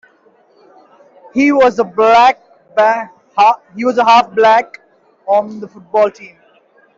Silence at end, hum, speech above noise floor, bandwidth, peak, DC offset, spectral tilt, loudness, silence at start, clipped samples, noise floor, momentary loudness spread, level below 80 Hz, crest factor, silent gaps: 0.7 s; none; 40 dB; 7.8 kHz; -2 dBFS; under 0.1%; -4.5 dB/octave; -12 LUFS; 1.35 s; under 0.1%; -51 dBFS; 14 LU; -58 dBFS; 12 dB; none